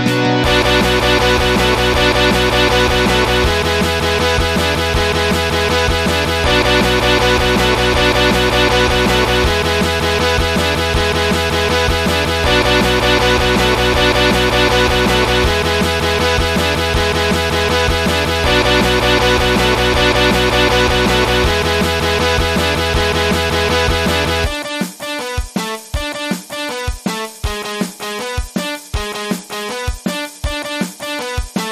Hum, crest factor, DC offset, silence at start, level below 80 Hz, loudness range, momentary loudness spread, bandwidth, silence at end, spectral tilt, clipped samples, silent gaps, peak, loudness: none; 14 dB; 0.1%; 0 s; -24 dBFS; 9 LU; 10 LU; 15.5 kHz; 0 s; -4 dB/octave; under 0.1%; none; 0 dBFS; -14 LUFS